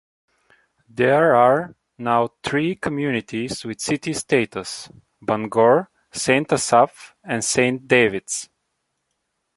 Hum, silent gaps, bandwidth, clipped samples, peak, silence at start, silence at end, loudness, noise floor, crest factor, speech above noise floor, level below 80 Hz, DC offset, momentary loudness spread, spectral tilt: none; none; 11.5 kHz; under 0.1%; -2 dBFS; 0.95 s; 1.15 s; -20 LUFS; -75 dBFS; 20 dB; 55 dB; -58 dBFS; under 0.1%; 14 LU; -4 dB/octave